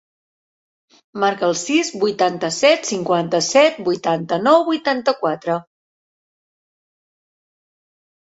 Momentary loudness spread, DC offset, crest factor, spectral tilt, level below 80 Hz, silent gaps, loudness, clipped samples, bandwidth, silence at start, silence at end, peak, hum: 7 LU; under 0.1%; 20 dB; -3.5 dB/octave; -66 dBFS; none; -18 LUFS; under 0.1%; 8 kHz; 1.15 s; 2.7 s; 0 dBFS; none